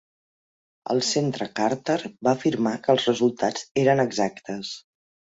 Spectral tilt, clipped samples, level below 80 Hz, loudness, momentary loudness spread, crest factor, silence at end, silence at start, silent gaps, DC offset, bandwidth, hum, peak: -4.5 dB/octave; under 0.1%; -66 dBFS; -24 LUFS; 12 LU; 20 dB; 0.6 s; 0.85 s; 3.71-3.75 s; under 0.1%; 8 kHz; none; -6 dBFS